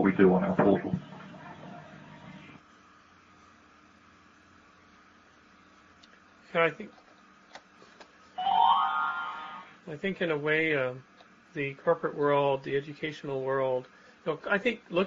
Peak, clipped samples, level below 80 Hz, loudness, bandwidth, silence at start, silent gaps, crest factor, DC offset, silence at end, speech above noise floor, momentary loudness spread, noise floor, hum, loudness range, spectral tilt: -10 dBFS; under 0.1%; -68 dBFS; -29 LUFS; 7.4 kHz; 0 s; none; 22 dB; under 0.1%; 0 s; 30 dB; 23 LU; -59 dBFS; none; 12 LU; -4.5 dB/octave